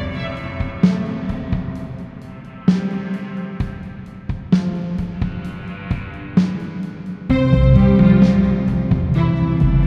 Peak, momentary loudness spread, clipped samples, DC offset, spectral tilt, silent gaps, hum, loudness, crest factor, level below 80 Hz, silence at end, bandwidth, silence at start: 0 dBFS; 17 LU; under 0.1%; under 0.1%; -9 dB/octave; none; none; -18 LUFS; 16 dB; -28 dBFS; 0 s; 6.8 kHz; 0 s